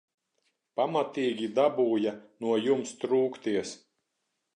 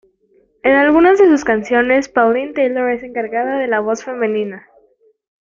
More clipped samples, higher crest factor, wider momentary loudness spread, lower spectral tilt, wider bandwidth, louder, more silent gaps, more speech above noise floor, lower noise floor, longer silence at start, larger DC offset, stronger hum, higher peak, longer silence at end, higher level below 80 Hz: neither; about the same, 18 dB vs 14 dB; about the same, 9 LU vs 11 LU; about the same, -5 dB/octave vs -5 dB/octave; first, 10 kHz vs 7.4 kHz; second, -29 LUFS vs -15 LUFS; neither; first, 53 dB vs 42 dB; first, -81 dBFS vs -56 dBFS; about the same, 0.75 s vs 0.65 s; neither; neither; second, -12 dBFS vs -2 dBFS; second, 0.8 s vs 0.95 s; second, -78 dBFS vs -52 dBFS